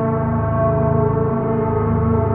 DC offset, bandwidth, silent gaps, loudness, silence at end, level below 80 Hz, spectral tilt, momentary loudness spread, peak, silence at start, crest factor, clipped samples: under 0.1%; 3.1 kHz; none; -18 LUFS; 0 s; -32 dBFS; -14.5 dB/octave; 2 LU; -6 dBFS; 0 s; 12 dB; under 0.1%